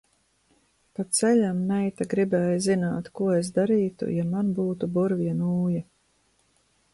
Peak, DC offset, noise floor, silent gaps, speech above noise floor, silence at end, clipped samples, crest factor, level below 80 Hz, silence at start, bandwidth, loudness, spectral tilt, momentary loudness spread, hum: -10 dBFS; under 0.1%; -67 dBFS; none; 43 dB; 1.1 s; under 0.1%; 16 dB; -62 dBFS; 1 s; 11.5 kHz; -25 LUFS; -6 dB/octave; 6 LU; none